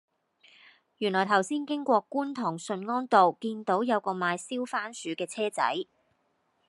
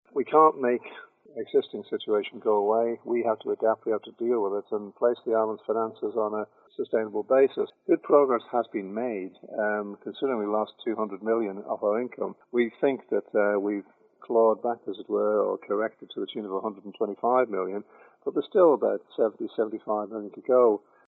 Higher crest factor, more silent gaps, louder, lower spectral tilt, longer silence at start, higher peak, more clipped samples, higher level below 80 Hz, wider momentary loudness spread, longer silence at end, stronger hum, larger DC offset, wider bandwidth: about the same, 22 dB vs 20 dB; neither; about the same, -28 LUFS vs -27 LUFS; second, -4.5 dB/octave vs -8.5 dB/octave; first, 1 s vs 0.15 s; about the same, -8 dBFS vs -6 dBFS; neither; about the same, -86 dBFS vs under -90 dBFS; second, 10 LU vs 13 LU; first, 0.85 s vs 0.3 s; neither; neither; first, 12 kHz vs 4.1 kHz